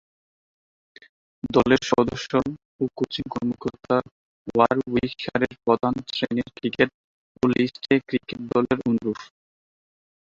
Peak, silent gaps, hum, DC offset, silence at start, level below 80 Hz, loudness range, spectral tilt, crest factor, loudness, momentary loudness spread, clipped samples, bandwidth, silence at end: -2 dBFS; 2.65-2.79 s, 4.11-4.45 s, 6.94-7.35 s; none; under 0.1%; 1.45 s; -54 dBFS; 1 LU; -6 dB/octave; 22 dB; -24 LUFS; 9 LU; under 0.1%; 7.6 kHz; 1.05 s